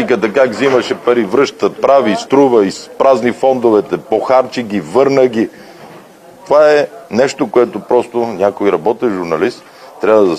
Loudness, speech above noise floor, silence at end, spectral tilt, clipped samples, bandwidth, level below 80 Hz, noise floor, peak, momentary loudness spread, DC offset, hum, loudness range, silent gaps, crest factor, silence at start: -13 LUFS; 26 dB; 0 s; -5.5 dB/octave; 0.1%; 14 kHz; -58 dBFS; -38 dBFS; 0 dBFS; 7 LU; under 0.1%; none; 2 LU; none; 12 dB; 0 s